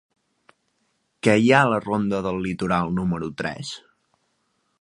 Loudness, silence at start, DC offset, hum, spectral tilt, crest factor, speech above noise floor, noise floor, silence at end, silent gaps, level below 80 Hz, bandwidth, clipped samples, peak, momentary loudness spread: -22 LUFS; 1.25 s; under 0.1%; none; -6 dB/octave; 24 dB; 49 dB; -71 dBFS; 1.05 s; none; -52 dBFS; 11.5 kHz; under 0.1%; 0 dBFS; 14 LU